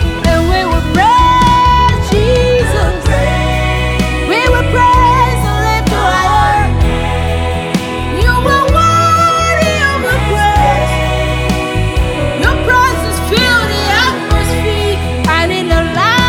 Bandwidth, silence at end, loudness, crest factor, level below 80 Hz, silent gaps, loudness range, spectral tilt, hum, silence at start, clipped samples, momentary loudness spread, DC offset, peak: 17 kHz; 0 s; -11 LUFS; 10 dB; -18 dBFS; none; 2 LU; -5 dB/octave; none; 0 s; under 0.1%; 6 LU; under 0.1%; 0 dBFS